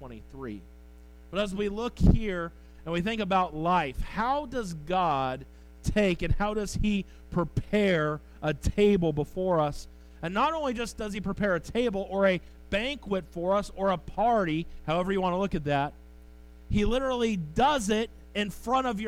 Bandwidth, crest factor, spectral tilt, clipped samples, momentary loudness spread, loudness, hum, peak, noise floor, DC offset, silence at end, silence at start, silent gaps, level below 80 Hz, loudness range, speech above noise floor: 16 kHz; 20 dB; -6 dB/octave; under 0.1%; 9 LU; -29 LUFS; none; -8 dBFS; -50 dBFS; under 0.1%; 0 s; 0 s; none; -38 dBFS; 2 LU; 22 dB